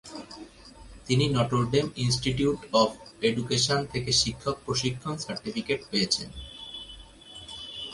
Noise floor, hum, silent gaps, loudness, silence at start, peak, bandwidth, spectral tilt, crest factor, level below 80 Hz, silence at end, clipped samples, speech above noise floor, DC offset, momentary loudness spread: -48 dBFS; none; none; -27 LUFS; 0.05 s; -8 dBFS; 11.5 kHz; -4 dB/octave; 20 dB; -50 dBFS; 0 s; under 0.1%; 21 dB; under 0.1%; 19 LU